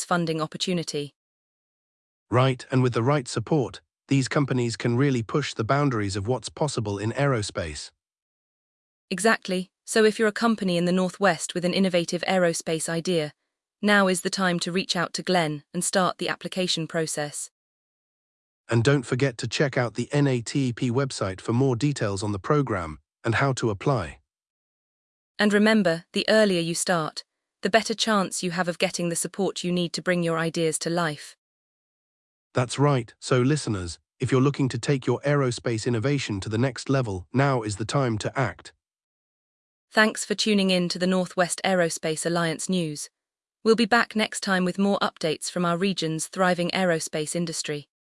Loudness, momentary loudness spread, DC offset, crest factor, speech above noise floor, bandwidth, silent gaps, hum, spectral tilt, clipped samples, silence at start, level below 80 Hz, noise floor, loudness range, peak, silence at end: -25 LUFS; 8 LU; under 0.1%; 20 dB; 65 dB; 12 kHz; 1.16-2.26 s, 8.22-9.08 s, 17.51-18.64 s, 24.50-25.35 s, 31.38-32.50 s, 39.03-39.88 s; none; -5 dB/octave; under 0.1%; 0 s; -60 dBFS; -89 dBFS; 4 LU; -6 dBFS; 0.4 s